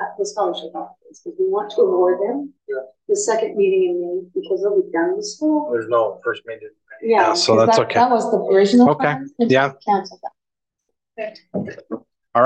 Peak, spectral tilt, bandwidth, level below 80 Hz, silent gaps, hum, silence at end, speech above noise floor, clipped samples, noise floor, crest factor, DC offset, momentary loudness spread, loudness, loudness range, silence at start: -2 dBFS; -4.5 dB/octave; 9.2 kHz; -66 dBFS; none; none; 0 s; 64 dB; under 0.1%; -82 dBFS; 16 dB; under 0.1%; 18 LU; -18 LUFS; 6 LU; 0 s